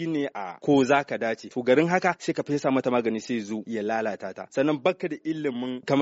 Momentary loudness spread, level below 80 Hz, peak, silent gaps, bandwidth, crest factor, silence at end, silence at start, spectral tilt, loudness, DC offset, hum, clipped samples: 10 LU; -68 dBFS; -8 dBFS; none; 8 kHz; 18 dB; 0 s; 0 s; -5 dB/octave; -26 LUFS; under 0.1%; none; under 0.1%